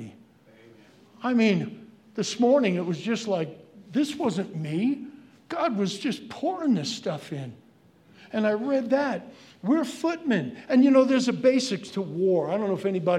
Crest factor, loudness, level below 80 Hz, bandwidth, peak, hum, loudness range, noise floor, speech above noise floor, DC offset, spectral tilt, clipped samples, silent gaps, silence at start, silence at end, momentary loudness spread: 18 dB; -26 LUFS; -78 dBFS; 12 kHz; -8 dBFS; none; 6 LU; -57 dBFS; 32 dB; under 0.1%; -5.5 dB/octave; under 0.1%; none; 0 s; 0 s; 13 LU